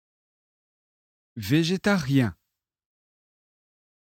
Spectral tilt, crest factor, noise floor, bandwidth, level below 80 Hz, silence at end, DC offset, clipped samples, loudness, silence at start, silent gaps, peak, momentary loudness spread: -6 dB/octave; 20 dB; -81 dBFS; 17 kHz; -60 dBFS; 1.85 s; under 0.1%; under 0.1%; -24 LUFS; 1.35 s; none; -8 dBFS; 13 LU